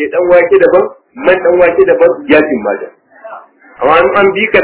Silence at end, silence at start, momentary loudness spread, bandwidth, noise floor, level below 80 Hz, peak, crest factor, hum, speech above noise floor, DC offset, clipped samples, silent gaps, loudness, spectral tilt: 0 s; 0 s; 9 LU; 4 kHz; -33 dBFS; -44 dBFS; 0 dBFS; 10 dB; none; 24 dB; under 0.1%; 1%; none; -9 LUFS; -9 dB/octave